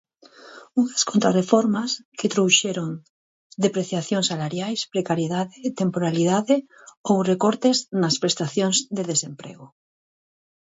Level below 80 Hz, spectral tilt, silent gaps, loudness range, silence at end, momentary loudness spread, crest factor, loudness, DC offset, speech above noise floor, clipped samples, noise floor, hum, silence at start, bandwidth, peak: -68 dBFS; -4 dB/octave; 2.05-2.12 s, 3.10-3.50 s, 6.97-7.04 s; 3 LU; 1.15 s; 9 LU; 22 dB; -22 LUFS; under 0.1%; 26 dB; under 0.1%; -48 dBFS; none; 0.45 s; 8 kHz; -2 dBFS